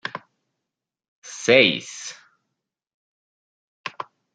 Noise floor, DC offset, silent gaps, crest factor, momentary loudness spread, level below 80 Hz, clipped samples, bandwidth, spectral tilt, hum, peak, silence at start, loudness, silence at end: -85 dBFS; under 0.1%; 1.08-1.22 s, 2.94-3.84 s; 24 dB; 23 LU; -72 dBFS; under 0.1%; 9.4 kHz; -3 dB/octave; none; -2 dBFS; 0.05 s; -18 LUFS; 0.35 s